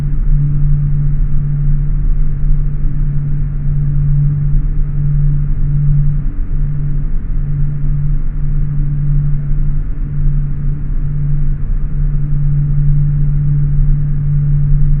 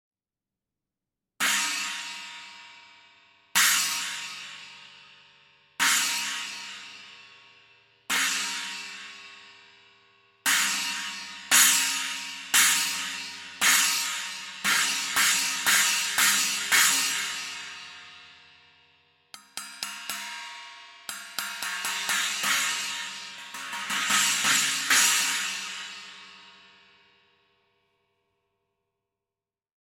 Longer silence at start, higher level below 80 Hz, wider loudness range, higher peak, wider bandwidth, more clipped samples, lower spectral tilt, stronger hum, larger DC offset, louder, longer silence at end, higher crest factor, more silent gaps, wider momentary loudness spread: second, 0 s vs 1.4 s; first, -14 dBFS vs -76 dBFS; second, 3 LU vs 12 LU; first, 0 dBFS vs -4 dBFS; second, 2.1 kHz vs 17 kHz; neither; first, -13.5 dB/octave vs 2 dB/octave; neither; neither; first, -17 LUFS vs -24 LUFS; second, 0 s vs 3.35 s; second, 12 dB vs 24 dB; neither; second, 6 LU vs 21 LU